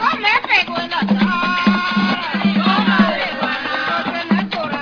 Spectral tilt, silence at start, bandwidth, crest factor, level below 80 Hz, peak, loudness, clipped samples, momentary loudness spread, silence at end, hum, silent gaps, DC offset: -6 dB/octave; 0 s; 5.4 kHz; 16 dB; -54 dBFS; 0 dBFS; -16 LUFS; under 0.1%; 6 LU; 0 s; none; none; under 0.1%